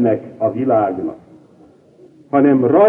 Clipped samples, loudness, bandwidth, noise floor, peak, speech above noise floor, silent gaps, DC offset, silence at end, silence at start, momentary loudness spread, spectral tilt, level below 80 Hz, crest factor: under 0.1%; -17 LUFS; 3.5 kHz; -47 dBFS; -2 dBFS; 33 dB; none; under 0.1%; 0 s; 0 s; 11 LU; -11 dB/octave; -60 dBFS; 14 dB